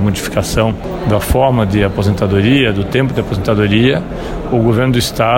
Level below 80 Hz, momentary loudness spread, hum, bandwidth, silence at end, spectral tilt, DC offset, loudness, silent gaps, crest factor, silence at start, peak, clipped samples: -28 dBFS; 6 LU; none; 16.5 kHz; 0 s; -6 dB/octave; under 0.1%; -14 LUFS; none; 12 dB; 0 s; 0 dBFS; under 0.1%